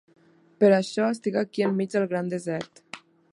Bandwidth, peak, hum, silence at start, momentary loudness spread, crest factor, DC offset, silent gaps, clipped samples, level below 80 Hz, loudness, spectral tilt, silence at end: 11 kHz; -6 dBFS; none; 0.6 s; 21 LU; 18 dB; under 0.1%; none; under 0.1%; -74 dBFS; -25 LUFS; -6.5 dB/octave; 0.35 s